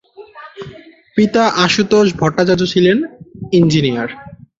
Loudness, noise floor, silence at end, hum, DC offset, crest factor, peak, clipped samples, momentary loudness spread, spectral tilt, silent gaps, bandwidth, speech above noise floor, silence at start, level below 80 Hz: -14 LUFS; -38 dBFS; 0.25 s; none; under 0.1%; 14 dB; 0 dBFS; under 0.1%; 21 LU; -5.5 dB/octave; none; 7.8 kHz; 26 dB; 0.2 s; -48 dBFS